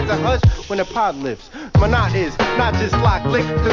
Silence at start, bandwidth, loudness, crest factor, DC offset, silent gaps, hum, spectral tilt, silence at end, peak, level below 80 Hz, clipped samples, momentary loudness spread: 0 s; 7.4 kHz; -18 LUFS; 14 dB; under 0.1%; none; none; -6.5 dB/octave; 0 s; -4 dBFS; -24 dBFS; under 0.1%; 7 LU